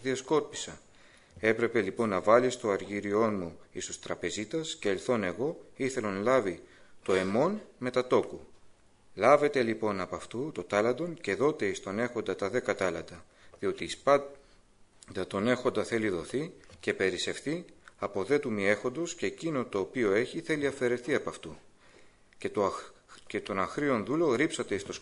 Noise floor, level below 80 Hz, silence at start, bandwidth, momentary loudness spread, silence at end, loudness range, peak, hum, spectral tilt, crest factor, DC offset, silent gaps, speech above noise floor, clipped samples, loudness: -60 dBFS; -62 dBFS; 0 s; 11 kHz; 12 LU; 0 s; 3 LU; -8 dBFS; none; -5 dB/octave; 22 dB; under 0.1%; none; 29 dB; under 0.1%; -30 LUFS